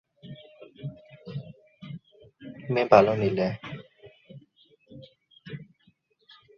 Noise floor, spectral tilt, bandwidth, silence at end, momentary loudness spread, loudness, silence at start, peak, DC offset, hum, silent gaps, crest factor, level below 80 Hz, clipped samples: -66 dBFS; -7.5 dB/octave; 6.8 kHz; 0.95 s; 30 LU; -23 LUFS; 0.25 s; -4 dBFS; under 0.1%; none; none; 26 dB; -64 dBFS; under 0.1%